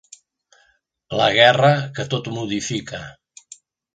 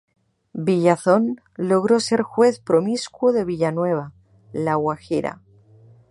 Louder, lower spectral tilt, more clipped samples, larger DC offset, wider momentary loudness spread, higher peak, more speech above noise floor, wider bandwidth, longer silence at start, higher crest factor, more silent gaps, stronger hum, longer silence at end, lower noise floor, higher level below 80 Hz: first, -18 LUFS vs -21 LUFS; second, -4.5 dB/octave vs -6 dB/octave; neither; neither; first, 19 LU vs 9 LU; about the same, 0 dBFS vs -2 dBFS; first, 44 dB vs 30 dB; second, 9.4 kHz vs 11.5 kHz; first, 1.1 s vs 0.55 s; about the same, 22 dB vs 18 dB; neither; neither; about the same, 0.8 s vs 0.75 s; first, -62 dBFS vs -50 dBFS; about the same, -58 dBFS vs -60 dBFS